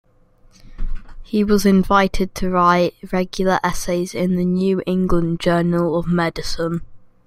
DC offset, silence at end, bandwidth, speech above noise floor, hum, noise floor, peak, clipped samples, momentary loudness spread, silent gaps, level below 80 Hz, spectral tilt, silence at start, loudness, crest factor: under 0.1%; 0.2 s; 15 kHz; 34 dB; none; -51 dBFS; -2 dBFS; under 0.1%; 10 LU; none; -32 dBFS; -6 dB/octave; 0.65 s; -19 LUFS; 16 dB